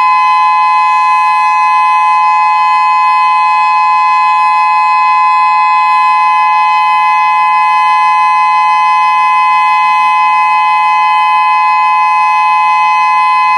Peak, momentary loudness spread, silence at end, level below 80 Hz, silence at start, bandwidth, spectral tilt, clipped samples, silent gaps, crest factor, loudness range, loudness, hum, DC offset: 0 dBFS; 1 LU; 0 s; -84 dBFS; 0 s; 11 kHz; 0.5 dB/octave; under 0.1%; none; 8 dB; 0 LU; -8 LUFS; none; under 0.1%